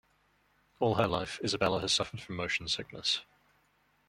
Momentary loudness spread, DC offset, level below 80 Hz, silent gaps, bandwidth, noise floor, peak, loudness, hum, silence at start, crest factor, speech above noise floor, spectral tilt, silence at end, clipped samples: 6 LU; under 0.1%; -60 dBFS; none; 16 kHz; -71 dBFS; -10 dBFS; -32 LUFS; none; 0.8 s; 24 dB; 39 dB; -3.5 dB/octave; 0.85 s; under 0.1%